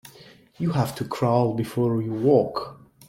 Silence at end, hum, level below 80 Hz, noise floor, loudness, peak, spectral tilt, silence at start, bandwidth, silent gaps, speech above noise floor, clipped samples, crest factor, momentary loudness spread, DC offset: 0.35 s; none; -60 dBFS; -50 dBFS; -24 LUFS; -6 dBFS; -7.5 dB/octave; 0.05 s; 16.5 kHz; none; 27 dB; under 0.1%; 18 dB; 9 LU; under 0.1%